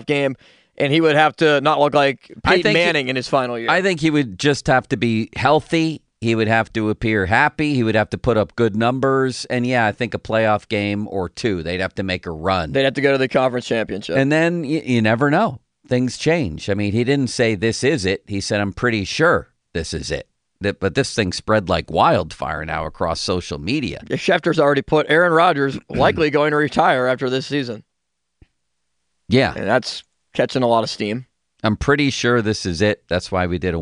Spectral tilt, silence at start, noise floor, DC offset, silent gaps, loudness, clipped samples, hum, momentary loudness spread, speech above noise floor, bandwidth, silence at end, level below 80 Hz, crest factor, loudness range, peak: -5.5 dB/octave; 0 s; -78 dBFS; under 0.1%; none; -19 LUFS; under 0.1%; none; 8 LU; 59 dB; 10.5 kHz; 0 s; -44 dBFS; 16 dB; 4 LU; -2 dBFS